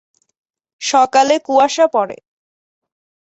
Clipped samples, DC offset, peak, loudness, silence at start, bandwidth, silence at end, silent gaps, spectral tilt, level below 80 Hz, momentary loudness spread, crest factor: under 0.1%; under 0.1%; -2 dBFS; -14 LUFS; 0.8 s; 8.2 kHz; 1.15 s; none; -2 dB/octave; -66 dBFS; 10 LU; 16 dB